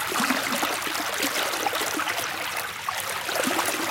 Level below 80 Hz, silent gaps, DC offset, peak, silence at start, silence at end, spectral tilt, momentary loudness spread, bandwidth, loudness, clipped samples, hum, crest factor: -64 dBFS; none; under 0.1%; -6 dBFS; 0 s; 0 s; -1 dB/octave; 5 LU; 17 kHz; -25 LUFS; under 0.1%; none; 20 dB